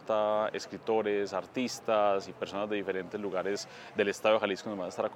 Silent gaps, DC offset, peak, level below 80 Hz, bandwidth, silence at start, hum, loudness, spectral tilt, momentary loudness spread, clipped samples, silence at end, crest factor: none; under 0.1%; -12 dBFS; -76 dBFS; 16 kHz; 0 s; none; -32 LUFS; -4 dB/octave; 9 LU; under 0.1%; 0 s; 20 dB